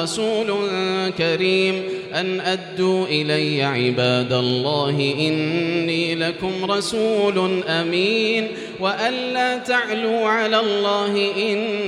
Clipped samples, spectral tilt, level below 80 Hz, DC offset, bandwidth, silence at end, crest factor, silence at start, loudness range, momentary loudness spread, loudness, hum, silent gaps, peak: under 0.1%; -5 dB/octave; -62 dBFS; under 0.1%; 12 kHz; 0 s; 16 dB; 0 s; 1 LU; 5 LU; -20 LUFS; none; none; -6 dBFS